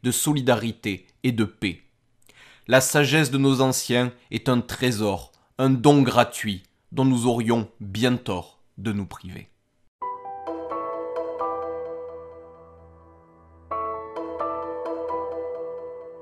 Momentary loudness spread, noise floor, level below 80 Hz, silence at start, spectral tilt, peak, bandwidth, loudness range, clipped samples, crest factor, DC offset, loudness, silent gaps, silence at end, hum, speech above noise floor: 16 LU; -59 dBFS; -56 dBFS; 0.05 s; -5 dB/octave; -2 dBFS; 15 kHz; 11 LU; under 0.1%; 22 dB; under 0.1%; -24 LUFS; 9.88-9.99 s; 0 s; none; 37 dB